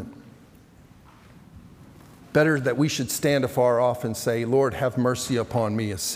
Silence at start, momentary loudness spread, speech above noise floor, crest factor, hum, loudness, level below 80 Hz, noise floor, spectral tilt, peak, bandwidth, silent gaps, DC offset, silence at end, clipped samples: 0 s; 5 LU; 28 dB; 18 dB; none; -23 LUFS; -56 dBFS; -51 dBFS; -5 dB/octave; -8 dBFS; 16.5 kHz; none; under 0.1%; 0 s; under 0.1%